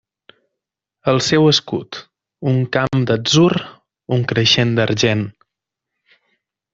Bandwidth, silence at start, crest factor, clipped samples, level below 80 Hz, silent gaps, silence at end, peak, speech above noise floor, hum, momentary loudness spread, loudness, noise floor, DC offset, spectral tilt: 8 kHz; 1.05 s; 16 dB; under 0.1%; -52 dBFS; none; 1.45 s; -2 dBFS; 66 dB; none; 12 LU; -16 LUFS; -82 dBFS; under 0.1%; -5 dB/octave